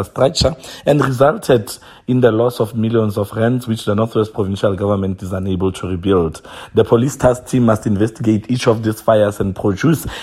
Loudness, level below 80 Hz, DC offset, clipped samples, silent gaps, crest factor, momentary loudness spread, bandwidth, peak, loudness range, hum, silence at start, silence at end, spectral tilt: -16 LUFS; -40 dBFS; under 0.1%; under 0.1%; none; 16 dB; 6 LU; 16 kHz; 0 dBFS; 3 LU; none; 0 s; 0 s; -6.5 dB/octave